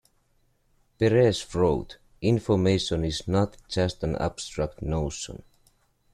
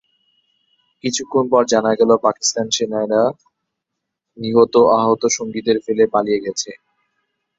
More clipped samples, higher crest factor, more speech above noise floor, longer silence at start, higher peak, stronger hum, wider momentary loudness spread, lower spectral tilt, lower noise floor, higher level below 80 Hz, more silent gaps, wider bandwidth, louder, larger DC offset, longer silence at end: neither; about the same, 20 dB vs 18 dB; second, 42 dB vs 63 dB; about the same, 1 s vs 1.05 s; second, -8 dBFS vs 0 dBFS; neither; about the same, 10 LU vs 9 LU; first, -6 dB/octave vs -3.5 dB/octave; second, -67 dBFS vs -79 dBFS; first, -44 dBFS vs -60 dBFS; neither; first, 13 kHz vs 8 kHz; second, -26 LUFS vs -17 LUFS; neither; about the same, 0.75 s vs 0.85 s